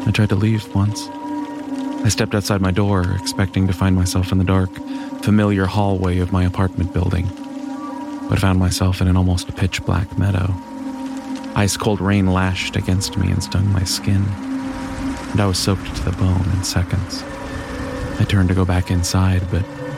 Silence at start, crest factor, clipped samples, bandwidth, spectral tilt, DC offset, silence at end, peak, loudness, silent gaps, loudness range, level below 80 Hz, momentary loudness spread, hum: 0 s; 14 dB; under 0.1%; 15 kHz; -5.5 dB/octave; under 0.1%; 0 s; -4 dBFS; -19 LUFS; none; 2 LU; -36 dBFS; 10 LU; none